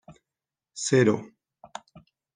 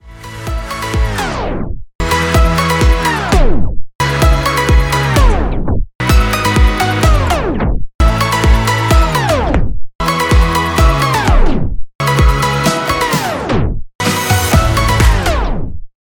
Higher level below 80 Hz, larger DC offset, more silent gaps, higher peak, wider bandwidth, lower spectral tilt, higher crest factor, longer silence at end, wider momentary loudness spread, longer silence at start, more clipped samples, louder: second, -70 dBFS vs -16 dBFS; neither; second, none vs 1.95-1.99 s, 3.95-3.99 s, 5.95-5.99 s, 7.95-7.99 s, 9.95-9.99 s, 11.95-11.99 s, 13.95-13.99 s; second, -8 dBFS vs 0 dBFS; second, 10 kHz vs 19 kHz; about the same, -5 dB/octave vs -5 dB/octave; first, 20 dB vs 12 dB; first, 1.1 s vs 0.2 s; first, 23 LU vs 9 LU; about the same, 0.1 s vs 0.05 s; neither; second, -24 LUFS vs -13 LUFS